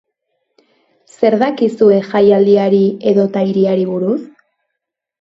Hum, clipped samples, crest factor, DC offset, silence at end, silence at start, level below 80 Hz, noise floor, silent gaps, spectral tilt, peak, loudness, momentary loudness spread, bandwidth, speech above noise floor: none; under 0.1%; 14 dB; under 0.1%; 0.95 s; 1.2 s; -60 dBFS; -78 dBFS; none; -8.5 dB/octave; 0 dBFS; -13 LUFS; 6 LU; 7.8 kHz; 66 dB